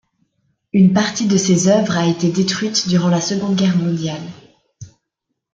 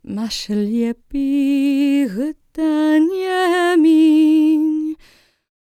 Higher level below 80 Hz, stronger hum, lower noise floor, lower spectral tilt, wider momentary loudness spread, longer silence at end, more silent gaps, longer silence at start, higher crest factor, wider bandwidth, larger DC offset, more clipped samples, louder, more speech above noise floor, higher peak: second, -56 dBFS vs -50 dBFS; neither; first, -77 dBFS vs -51 dBFS; about the same, -5 dB/octave vs -5 dB/octave; second, 8 LU vs 11 LU; about the same, 0.65 s vs 0.7 s; neither; first, 0.75 s vs 0.1 s; about the same, 16 dB vs 12 dB; second, 7.8 kHz vs 13.5 kHz; neither; neither; about the same, -16 LUFS vs -16 LUFS; first, 61 dB vs 34 dB; first, -2 dBFS vs -6 dBFS